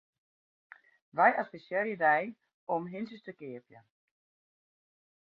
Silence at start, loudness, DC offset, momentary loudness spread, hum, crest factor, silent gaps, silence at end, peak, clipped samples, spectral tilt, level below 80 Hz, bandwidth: 1.15 s; -30 LUFS; under 0.1%; 19 LU; none; 24 dB; 2.54-2.67 s; 1.4 s; -10 dBFS; under 0.1%; -8 dB/octave; -86 dBFS; 5.2 kHz